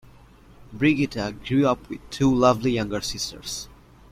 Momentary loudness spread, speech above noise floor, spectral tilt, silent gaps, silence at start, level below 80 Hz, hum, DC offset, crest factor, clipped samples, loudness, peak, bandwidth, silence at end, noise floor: 13 LU; 27 dB; -5.5 dB/octave; none; 0.6 s; -46 dBFS; none; under 0.1%; 20 dB; under 0.1%; -23 LUFS; -4 dBFS; 16 kHz; 0.45 s; -50 dBFS